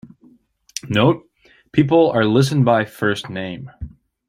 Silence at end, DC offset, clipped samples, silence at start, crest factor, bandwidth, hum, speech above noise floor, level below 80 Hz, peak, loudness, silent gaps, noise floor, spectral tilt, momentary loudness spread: 0.4 s; under 0.1%; under 0.1%; 0.05 s; 18 dB; 15 kHz; none; 37 dB; -48 dBFS; -2 dBFS; -17 LUFS; none; -53 dBFS; -6.5 dB/octave; 18 LU